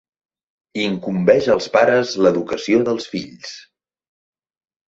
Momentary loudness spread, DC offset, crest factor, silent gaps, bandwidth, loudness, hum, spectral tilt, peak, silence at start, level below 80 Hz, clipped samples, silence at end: 17 LU; under 0.1%; 18 dB; none; 7.8 kHz; -17 LUFS; none; -5.5 dB/octave; -2 dBFS; 0.75 s; -58 dBFS; under 0.1%; 1.3 s